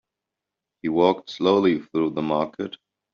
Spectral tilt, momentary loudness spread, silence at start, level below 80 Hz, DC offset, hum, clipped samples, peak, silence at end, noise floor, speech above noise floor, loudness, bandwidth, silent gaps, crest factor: -5 dB/octave; 12 LU; 0.85 s; -64 dBFS; under 0.1%; none; under 0.1%; -6 dBFS; 0.4 s; -86 dBFS; 64 dB; -23 LUFS; 7 kHz; none; 18 dB